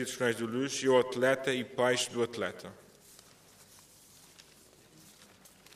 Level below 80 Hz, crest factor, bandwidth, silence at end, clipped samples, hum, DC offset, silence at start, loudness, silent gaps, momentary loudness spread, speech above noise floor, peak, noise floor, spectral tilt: -74 dBFS; 20 dB; 15.5 kHz; 0.5 s; under 0.1%; none; under 0.1%; 0 s; -30 LUFS; none; 11 LU; 29 dB; -14 dBFS; -60 dBFS; -3.5 dB/octave